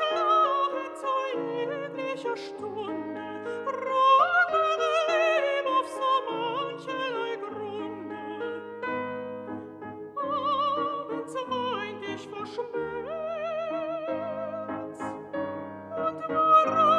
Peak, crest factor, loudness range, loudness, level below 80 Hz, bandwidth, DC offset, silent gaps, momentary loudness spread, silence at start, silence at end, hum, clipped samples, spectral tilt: -10 dBFS; 18 dB; 9 LU; -28 LUFS; -72 dBFS; 11.5 kHz; under 0.1%; none; 14 LU; 0 s; 0 s; none; under 0.1%; -4.5 dB/octave